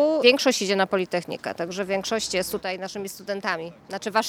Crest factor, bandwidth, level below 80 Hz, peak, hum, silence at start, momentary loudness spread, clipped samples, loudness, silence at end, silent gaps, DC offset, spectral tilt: 22 dB; 18 kHz; -62 dBFS; -2 dBFS; none; 0 s; 14 LU; under 0.1%; -25 LUFS; 0 s; none; under 0.1%; -3 dB/octave